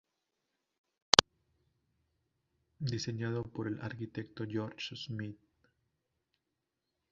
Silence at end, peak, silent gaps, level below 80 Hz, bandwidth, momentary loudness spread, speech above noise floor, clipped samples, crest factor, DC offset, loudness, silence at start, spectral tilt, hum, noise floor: 1.75 s; 0 dBFS; none; -64 dBFS; 7.4 kHz; 17 LU; 48 dB; under 0.1%; 38 dB; under 0.1%; -33 LUFS; 2.8 s; -2.5 dB/octave; none; -86 dBFS